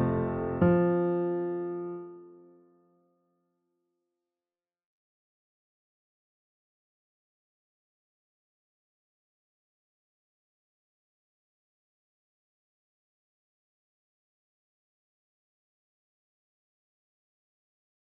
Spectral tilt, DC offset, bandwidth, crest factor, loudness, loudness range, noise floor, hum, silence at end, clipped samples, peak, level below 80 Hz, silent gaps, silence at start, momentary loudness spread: -10 dB/octave; under 0.1%; 3.5 kHz; 26 dB; -29 LUFS; 16 LU; under -90 dBFS; none; 15.85 s; under 0.1%; -12 dBFS; -62 dBFS; none; 0 s; 15 LU